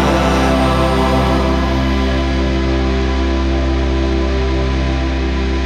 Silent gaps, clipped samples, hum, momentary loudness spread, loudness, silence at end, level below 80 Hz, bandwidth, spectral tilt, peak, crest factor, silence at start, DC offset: none; under 0.1%; none; 4 LU; -16 LUFS; 0 s; -18 dBFS; 9.8 kHz; -6.5 dB/octave; -2 dBFS; 12 dB; 0 s; under 0.1%